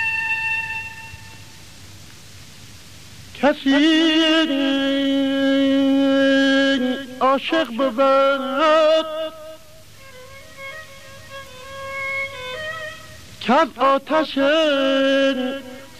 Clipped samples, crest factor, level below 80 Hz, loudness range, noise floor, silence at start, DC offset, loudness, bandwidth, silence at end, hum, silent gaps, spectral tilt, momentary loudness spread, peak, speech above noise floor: under 0.1%; 14 dB; -56 dBFS; 13 LU; -45 dBFS; 0 s; 0.6%; -18 LUFS; 14.5 kHz; 0.1 s; none; none; -4 dB/octave; 21 LU; -6 dBFS; 28 dB